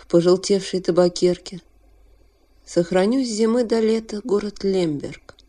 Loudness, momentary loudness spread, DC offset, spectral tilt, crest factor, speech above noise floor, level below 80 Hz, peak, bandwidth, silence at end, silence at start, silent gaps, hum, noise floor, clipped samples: -20 LUFS; 11 LU; under 0.1%; -5.5 dB/octave; 16 dB; 35 dB; -52 dBFS; -4 dBFS; 11 kHz; 0.3 s; 0.1 s; none; none; -55 dBFS; under 0.1%